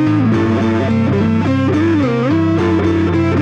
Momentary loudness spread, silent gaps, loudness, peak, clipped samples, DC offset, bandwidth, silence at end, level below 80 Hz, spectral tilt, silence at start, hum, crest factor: 1 LU; none; -14 LUFS; -4 dBFS; under 0.1%; under 0.1%; 8 kHz; 0 s; -42 dBFS; -8.5 dB/octave; 0 s; none; 10 dB